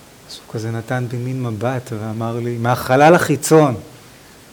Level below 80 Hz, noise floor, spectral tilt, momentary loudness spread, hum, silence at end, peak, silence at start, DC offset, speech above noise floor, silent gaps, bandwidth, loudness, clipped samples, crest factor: -54 dBFS; -43 dBFS; -6 dB/octave; 16 LU; none; 0.55 s; 0 dBFS; 0.3 s; under 0.1%; 26 dB; none; over 20 kHz; -17 LUFS; under 0.1%; 18 dB